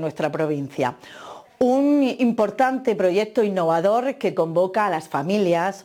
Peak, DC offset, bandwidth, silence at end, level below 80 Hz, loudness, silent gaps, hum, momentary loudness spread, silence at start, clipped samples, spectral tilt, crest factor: -8 dBFS; under 0.1%; 17 kHz; 0.05 s; -68 dBFS; -21 LUFS; none; none; 7 LU; 0 s; under 0.1%; -6.5 dB/octave; 12 dB